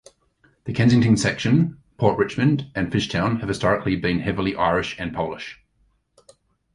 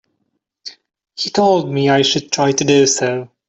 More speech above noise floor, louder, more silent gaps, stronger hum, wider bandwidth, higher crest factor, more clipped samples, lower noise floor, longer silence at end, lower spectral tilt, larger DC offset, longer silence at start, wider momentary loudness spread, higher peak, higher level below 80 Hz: second, 44 dB vs 56 dB; second, -21 LUFS vs -15 LUFS; neither; neither; first, 11.5 kHz vs 8.4 kHz; first, 20 dB vs 14 dB; neither; second, -65 dBFS vs -70 dBFS; first, 1.2 s vs 0.2 s; first, -6 dB/octave vs -3.5 dB/octave; neither; about the same, 0.65 s vs 0.65 s; second, 10 LU vs 22 LU; about the same, -2 dBFS vs -2 dBFS; first, -46 dBFS vs -58 dBFS